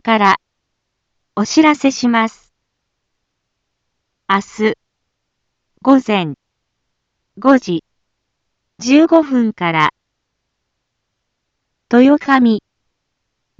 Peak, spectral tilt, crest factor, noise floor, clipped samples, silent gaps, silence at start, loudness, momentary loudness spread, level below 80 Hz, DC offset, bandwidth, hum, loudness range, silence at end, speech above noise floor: 0 dBFS; -5 dB/octave; 16 dB; -73 dBFS; under 0.1%; none; 0.05 s; -14 LUFS; 12 LU; -62 dBFS; under 0.1%; 7.8 kHz; none; 5 LU; 1 s; 61 dB